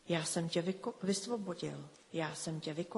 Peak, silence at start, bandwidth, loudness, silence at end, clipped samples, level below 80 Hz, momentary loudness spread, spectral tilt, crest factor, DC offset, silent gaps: -20 dBFS; 0.05 s; 11.5 kHz; -38 LUFS; 0 s; under 0.1%; -76 dBFS; 8 LU; -4.5 dB/octave; 18 dB; under 0.1%; none